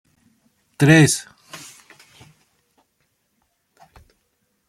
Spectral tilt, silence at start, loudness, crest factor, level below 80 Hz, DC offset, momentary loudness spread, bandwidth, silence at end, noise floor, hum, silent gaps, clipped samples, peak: -5 dB/octave; 0.8 s; -15 LUFS; 20 dB; -58 dBFS; under 0.1%; 27 LU; 14 kHz; 3.15 s; -69 dBFS; none; none; under 0.1%; -2 dBFS